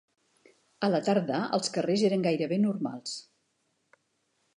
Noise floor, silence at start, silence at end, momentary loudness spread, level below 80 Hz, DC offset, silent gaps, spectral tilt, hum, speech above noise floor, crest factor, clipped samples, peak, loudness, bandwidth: -75 dBFS; 0.8 s; 1.35 s; 10 LU; -80 dBFS; under 0.1%; none; -5.5 dB/octave; none; 48 dB; 18 dB; under 0.1%; -14 dBFS; -28 LUFS; 11 kHz